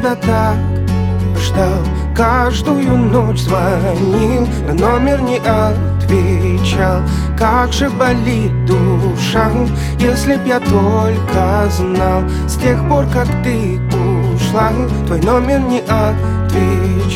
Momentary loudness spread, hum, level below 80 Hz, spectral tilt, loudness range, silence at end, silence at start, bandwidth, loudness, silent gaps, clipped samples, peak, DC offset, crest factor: 3 LU; none; -22 dBFS; -6.5 dB/octave; 1 LU; 0 s; 0 s; 16 kHz; -14 LUFS; none; under 0.1%; 0 dBFS; under 0.1%; 12 dB